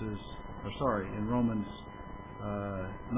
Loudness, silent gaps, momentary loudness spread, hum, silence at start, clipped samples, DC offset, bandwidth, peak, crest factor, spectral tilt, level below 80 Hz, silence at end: -35 LUFS; none; 15 LU; none; 0 s; under 0.1%; under 0.1%; 3.8 kHz; -18 dBFS; 18 dB; -6.5 dB/octave; -50 dBFS; 0 s